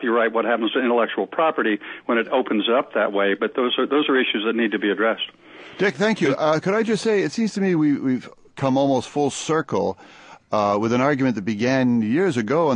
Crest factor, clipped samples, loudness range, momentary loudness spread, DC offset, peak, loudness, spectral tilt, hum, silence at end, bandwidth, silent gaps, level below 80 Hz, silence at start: 16 dB; under 0.1%; 2 LU; 5 LU; under 0.1%; -6 dBFS; -21 LUFS; -5.5 dB/octave; none; 0 s; 10.5 kHz; none; -62 dBFS; 0 s